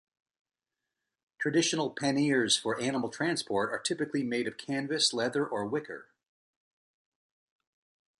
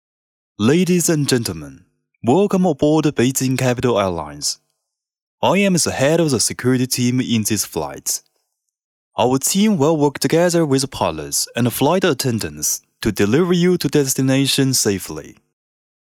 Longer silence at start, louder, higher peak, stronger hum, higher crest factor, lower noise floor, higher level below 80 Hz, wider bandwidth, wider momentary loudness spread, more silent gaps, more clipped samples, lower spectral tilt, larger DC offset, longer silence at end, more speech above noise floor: first, 1.4 s vs 0.6 s; second, -30 LUFS vs -17 LUFS; second, -12 dBFS vs -4 dBFS; neither; first, 20 dB vs 14 dB; first, -89 dBFS vs -78 dBFS; second, -74 dBFS vs -50 dBFS; second, 11.5 kHz vs 19.5 kHz; about the same, 8 LU vs 8 LU; second, none vs 5.22-5.38 s, 8.84-9.11 s; neither; about the same, -3.5 dB/octave vs -4.5 dB/octave; neither; first, 2.15 s vs 0.75 s; about the same, 58 dB vs 61 dB